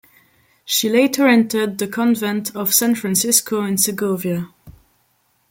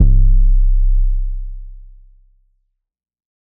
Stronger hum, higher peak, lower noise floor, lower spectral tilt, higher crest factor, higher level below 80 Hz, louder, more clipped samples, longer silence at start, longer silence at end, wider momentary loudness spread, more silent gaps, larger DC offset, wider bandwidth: neither; about the same, 0 dBFS vs 0 dBFS; second, -63 dBFS vs -67 dBFS; second, -3 dB/octave vs -16.5 dB/octave; first, 18 dB vs 12 dB; second, -60 dBFS vs -14 dBFS; about the same, -17 LUFS vs -18 LUFS; neither; first, 0.65 s vs 0 s; second, 0.8 s vs 1.7 s; second, 8 LU vs 20 LU; neither; neither; first, 17 kHz vs 0.5 kHz